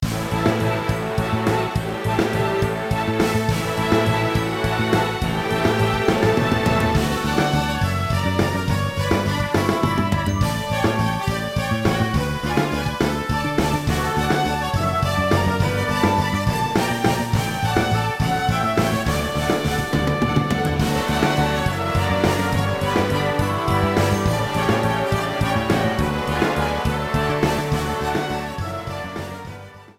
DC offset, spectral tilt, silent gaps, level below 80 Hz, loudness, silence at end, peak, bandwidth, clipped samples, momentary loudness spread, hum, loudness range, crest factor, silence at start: under 0.1%; -5.5 dB/octave; none; -34 dBFS; -21 LUFS; 0.05 s; -4 dBFS; 16.5 kHz; under 0.1%; 4 LU; none; 2 LU; 18 dB; 0 s